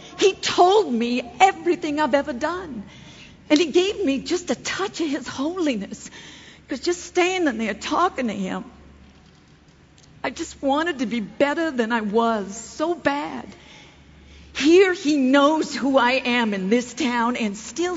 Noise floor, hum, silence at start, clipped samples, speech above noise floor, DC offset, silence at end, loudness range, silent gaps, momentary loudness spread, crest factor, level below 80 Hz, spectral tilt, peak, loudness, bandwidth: -52 dBFS; none; 0 s; under 0.1%; 30 dB; under 0.1%; 0 s; 7 LU; none; 15 LU; 20 dB; -54 dBFS; -4 dB/octave; -2 dBFS; -21 LUFS; 8 kHz